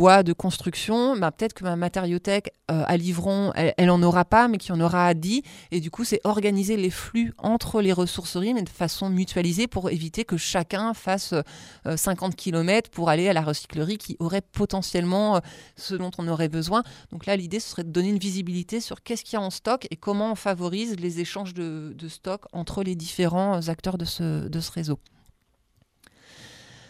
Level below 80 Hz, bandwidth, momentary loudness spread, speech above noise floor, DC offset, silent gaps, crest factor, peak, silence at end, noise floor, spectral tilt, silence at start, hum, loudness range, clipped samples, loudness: -50 dBFS; 16 kHz; 10 LU; 42 dB; under 0.1%; none; 22 dB; -2 dBFS; 0.3 s; -66 dBFS; -5.5 dB/octave; 0 s; none; 7 LU; under 0.1%; -25 LUFS